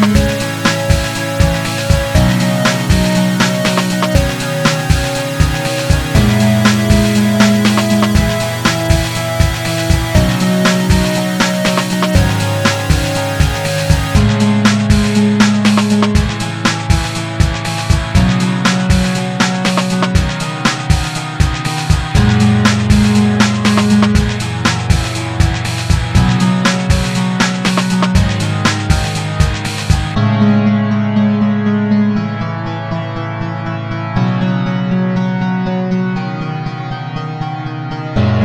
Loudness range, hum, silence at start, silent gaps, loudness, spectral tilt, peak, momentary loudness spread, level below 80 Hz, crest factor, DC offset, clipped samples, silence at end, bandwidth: 5 LU; none; 0 s; none; -14 LUFS; -5.5 dB/octave; 0 dBFS; 8 LU; -22 dBFS; 12 dB; under 0.1%; under 0.1%; 0 s; 19 kHz